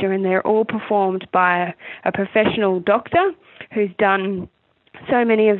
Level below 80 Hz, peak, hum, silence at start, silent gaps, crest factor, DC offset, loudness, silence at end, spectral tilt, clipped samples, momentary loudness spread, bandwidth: -58 dBFS; -4 dBFS; none; 0 s; none; 16 dB; under 0.1%; -19 LUFS; 0 s; -10.5 dB/octave; under 0.1%; 10 LU; 4.2 kHz